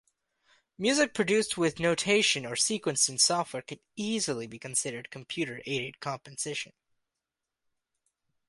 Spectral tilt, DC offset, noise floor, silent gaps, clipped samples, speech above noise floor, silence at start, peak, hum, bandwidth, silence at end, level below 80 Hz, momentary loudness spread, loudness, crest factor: -2.5 dB/octave; under 0.1%; -88 dBFS; none; under 0.1%; 58 dB; 0.8 s; -10 dBFS; none; 11.5 kHz; 1.85 s; -70 dBFS; 13 LU; -28 LUFS; 22 dB